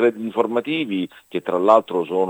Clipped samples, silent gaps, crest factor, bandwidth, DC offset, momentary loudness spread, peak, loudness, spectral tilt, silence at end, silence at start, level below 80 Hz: under 0.1%; none; 20 dB; 15.5 kHz; under 0.1%; 11 LU; 0 dBFS; -20 LUFS; -6.5 dB/octave; 0 s; 0 s; -72 dBFS